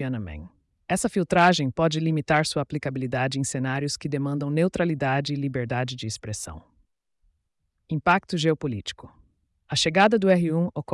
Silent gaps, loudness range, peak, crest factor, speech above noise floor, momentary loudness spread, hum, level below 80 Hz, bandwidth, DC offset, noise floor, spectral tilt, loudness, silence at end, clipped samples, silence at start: none; 5 LU; -10 dBFS; 16 dB; 51 dB; 14 LU; none; -54 dBFS; 12 kHz; under 0.1%; -75 dBFS; -5 dB/octave; -24 LUFS; 0 s; under 0.1%; 0 s